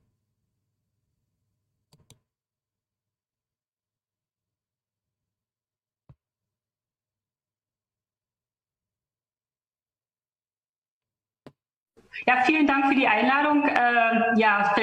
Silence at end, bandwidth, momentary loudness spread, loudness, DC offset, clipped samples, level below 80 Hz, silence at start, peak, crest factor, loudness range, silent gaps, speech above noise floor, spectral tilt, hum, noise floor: 0 s; 9.6 kHz; 2 LU; -21 LUFS; under 0.1%; under 0.1%; -72 dBFS; 12.15 s; -4 dBFS; 26 dB; 8 LU; none; over 69 dB; -5.5 dB/octave; none; under -90 dBFS